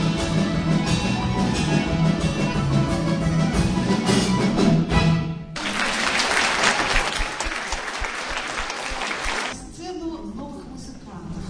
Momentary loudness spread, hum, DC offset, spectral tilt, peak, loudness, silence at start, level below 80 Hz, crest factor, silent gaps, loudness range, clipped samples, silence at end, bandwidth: 15 LU; none; under 0.1%; -5 dB/octave; -4 dBFS; -22 LUFS; 0 s; -34 dBFS; 18 dB; none; 7 LU; under 0.1%; 0 s; 10.5 kHz